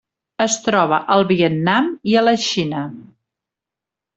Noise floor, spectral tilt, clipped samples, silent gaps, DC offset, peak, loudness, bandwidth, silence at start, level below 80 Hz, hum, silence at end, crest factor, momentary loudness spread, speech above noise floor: -86 dBFS; -4.5 dB/octave; under 0.1%; none; under 0.1%; -2 dBFS; -17 LUFS; 8.2 kHz; 0.4 s; -60 dBFS; none; 1.15 s; 16 dB; 7 LU; 69 dB